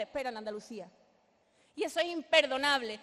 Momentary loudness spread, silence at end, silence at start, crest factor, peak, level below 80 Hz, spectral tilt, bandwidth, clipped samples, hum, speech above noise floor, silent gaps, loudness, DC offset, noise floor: 20 LU; 0 s; 0 s; 22 dB; -10 dBFS; -74 dBFS; -2 dB/octave; 13 kHz; under 0.1%; none; 37 dB; none; -31 LUFS; under 0.1%; -70 dBFS